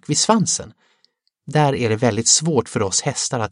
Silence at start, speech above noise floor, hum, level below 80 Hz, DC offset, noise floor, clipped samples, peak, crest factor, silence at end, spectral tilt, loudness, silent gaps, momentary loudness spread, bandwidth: 0.1 s; 45 dB; none; -56 dBFS; under 0.1%; -64 dBFS; under 0.1%; 0 dBFS; 18 dB; 0.05 s; -3.5 dB/octave; -18 LUFS; none; 7 LU; 11.5 kHz